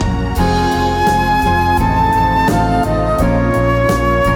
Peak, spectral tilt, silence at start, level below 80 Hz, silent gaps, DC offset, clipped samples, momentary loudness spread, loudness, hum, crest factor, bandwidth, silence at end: -2 dBFS; -6.5 dB/octave; 0 s; -22 dBFS; none; under 0.1%; under 0.1%; 2 LU; -14 LUFS; none; 12 dB; 19 kHz; 0 s